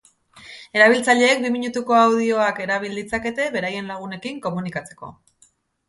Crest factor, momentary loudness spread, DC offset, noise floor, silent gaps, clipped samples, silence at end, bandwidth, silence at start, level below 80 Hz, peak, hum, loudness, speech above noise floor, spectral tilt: 20 dB; 18 LU; under 0.1%; -59 dBFS; none; under 0.1%; 0.8 s; 11.5 kHz; 0.35 s; -58 dBFS; -2 dBFS; none; -20 LUFS; 39 dB; -4 dB/octave